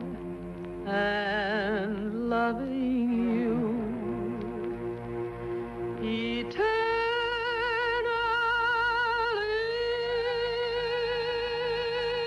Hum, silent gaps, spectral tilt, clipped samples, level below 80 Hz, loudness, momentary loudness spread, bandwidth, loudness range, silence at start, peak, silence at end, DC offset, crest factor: none; none; -6 dB/octave; under 0.1%; -52 dBFS; -29 LUFS; 9 LU; 11.5 kHz; 4 LU; 0 s; -16 dBFS; 0 s; under 0.1%; 12 dB